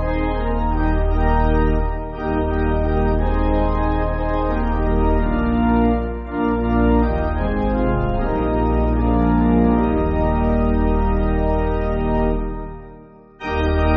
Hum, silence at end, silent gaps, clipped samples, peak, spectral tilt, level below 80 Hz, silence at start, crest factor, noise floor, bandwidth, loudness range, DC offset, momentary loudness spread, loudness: none; 0 s; none; under 0.1%; -4 dBFS; -7.5 dB/octave; -22 dBFS; 0 s; 14 dB; -42 dBFS; 5 kHz; 2 LU; under 0.1%; 6 LU; -20 LUFS